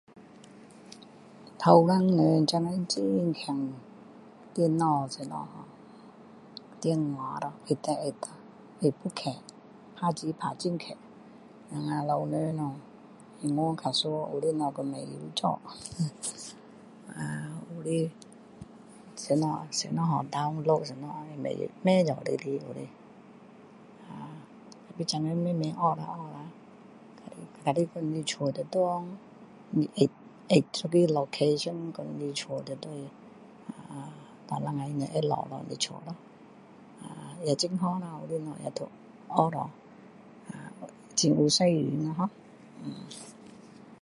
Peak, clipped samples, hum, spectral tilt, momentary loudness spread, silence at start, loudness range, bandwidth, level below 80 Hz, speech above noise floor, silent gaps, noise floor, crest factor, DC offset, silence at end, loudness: -4 dBFS; under 0.1%; none; -5.5 dB/octave; 22 LU; 0.15 s; 7 LU; 11.5 kHz; -72 dBFS; 24 dB; none; -53 dBFS; 26 dB; under 0.1%; 0.05 s; -30 LUFS